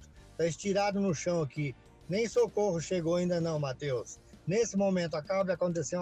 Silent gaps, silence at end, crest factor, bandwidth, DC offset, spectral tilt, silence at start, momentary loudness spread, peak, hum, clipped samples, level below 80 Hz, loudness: none; 0 s; 12 dB; 10 kHz; under 0.1%; -5.5 dB/octave; 0 s; 8 LU; -20 dBFS; none; under 0.1%; -60 dBFS; -32 LUFS